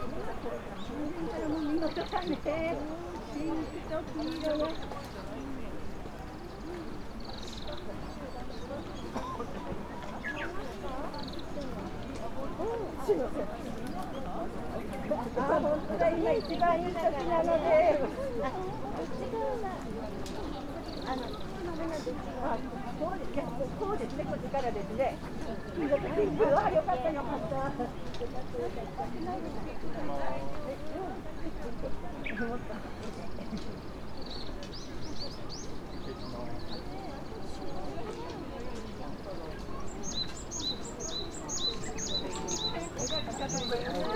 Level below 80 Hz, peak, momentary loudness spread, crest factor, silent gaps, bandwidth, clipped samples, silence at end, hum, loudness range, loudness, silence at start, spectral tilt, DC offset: -46 dBFS; -14 dBFS; 12 LU; 20 dB; none; 15 kHz; under 0.1%; 0 s; none; 11 LU; -35 LUFS; 0 s; -4.5 dB/octave; under 0.1%